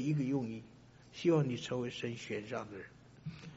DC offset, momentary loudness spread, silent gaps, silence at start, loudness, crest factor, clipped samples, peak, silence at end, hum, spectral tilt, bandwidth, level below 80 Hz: under 0.1%; 18 LU; none; 0 s; -37 LUFS; 18 dB; under 0.1%; -20 dBFS; 0 s; 60 Hz at -60 dBFS; -6.5 dB/octave; 7.6 kHz; -70 dBFS